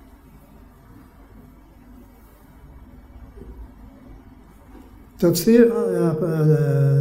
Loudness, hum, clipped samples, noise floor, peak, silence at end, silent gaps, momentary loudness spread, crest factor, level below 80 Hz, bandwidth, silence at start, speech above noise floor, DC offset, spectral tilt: -18 LUFS; none; under 0.1%; -48 dBFS; -2 dBFS; 0 s; none; 27 LU; 20 dB; -48 dBFS; 16 kHz; 3.15 s; 31 dB; under 0.1%; -7.5 dB/octave